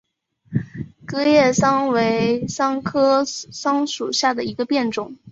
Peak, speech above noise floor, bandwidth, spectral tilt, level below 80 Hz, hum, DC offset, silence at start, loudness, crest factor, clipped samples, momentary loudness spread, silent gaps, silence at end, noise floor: -4 dBFS; 33 dB; 8 kHz; -4.5 dB/octave; -54 dBFS; none; under 0.1%; 0.5 s; -20 LUFS; 16 dB; under 0.1%; 12 LU; none; 0 s; -52 dBFS